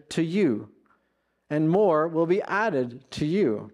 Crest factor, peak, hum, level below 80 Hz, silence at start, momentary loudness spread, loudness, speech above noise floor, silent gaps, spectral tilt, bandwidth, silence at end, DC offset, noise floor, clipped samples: 14 dB; -10 dBFS; none; -64 dBFS; 0.1 s; 10 LU; -25 LUFS; 49 dB; none; -7 dB/octave; 11 kHz; 0.05 s; under 0.1%; -73 dBFS; under 0.1%